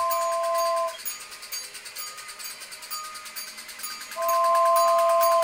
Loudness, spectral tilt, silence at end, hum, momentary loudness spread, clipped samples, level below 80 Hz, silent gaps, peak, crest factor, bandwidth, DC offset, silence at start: -26 LUFS; 1 dB/octave; 0 s; none; 16 LU; under 0.1%; -72 dBFS; none; -10 dBFS; 16 dB; 18 kHz; under 0.1%; 0 s